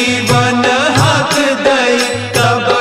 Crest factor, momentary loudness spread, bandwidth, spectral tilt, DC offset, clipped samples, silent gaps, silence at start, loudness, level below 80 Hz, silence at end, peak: 12 dB; 2 LU; 16 kHz; -4 dB/octave; under 0.1%; under 0.1%; none; 0 s; -11 LUFS; -40 dBFS; 0 s; 0 dBFS